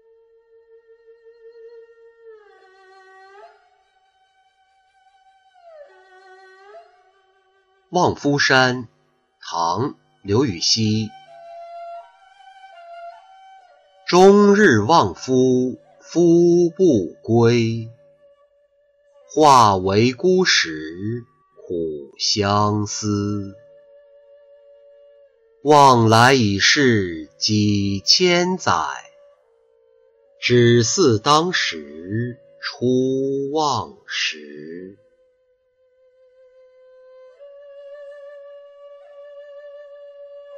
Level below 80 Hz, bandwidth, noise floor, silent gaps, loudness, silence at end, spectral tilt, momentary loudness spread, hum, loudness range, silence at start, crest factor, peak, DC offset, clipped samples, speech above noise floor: -58 dBFS; 11 kHz; -63 dBFS; none; -17 LUFS; 0 s; -4.5 dB/octave; 25 LU; none; 9 LU; 1.65 s; 18 dB; -2 dBFS; under 0.1%; under 0.1%; 46 dB